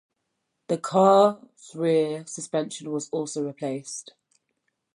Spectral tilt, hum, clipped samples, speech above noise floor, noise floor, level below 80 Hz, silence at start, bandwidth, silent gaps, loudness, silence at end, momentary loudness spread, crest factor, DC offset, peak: -5.5 dB/octave; none; under 0.1%; 54 dB; -79 dBFS; -80 dBFS; 0.7 s; 11.5 kHz; none; -24 LUFS; 0.95 s; 17 LU; 20 dB; under 0.1%; -6 dBFS